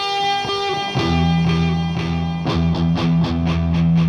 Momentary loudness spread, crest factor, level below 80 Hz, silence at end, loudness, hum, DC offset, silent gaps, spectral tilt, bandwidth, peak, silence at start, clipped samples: 4 LU; 10 dB; -36 dBFS; 0 s; -19 LUFS; none; under 0.1%; none; -6.5 dB/octave; 6.8 kHz; -8 dBFS; 0 s; under 0.1%